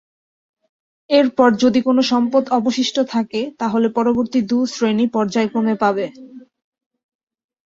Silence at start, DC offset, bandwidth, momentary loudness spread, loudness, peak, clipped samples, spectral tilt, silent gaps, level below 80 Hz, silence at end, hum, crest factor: 1.1 s; under 0.1%; 7.8 kHz; 6 LU; -17 LUFS; -2 dBFS; under 0.1%; -5 dB/octave; none; -60 dBFS; 1.25 s; none; 16 dB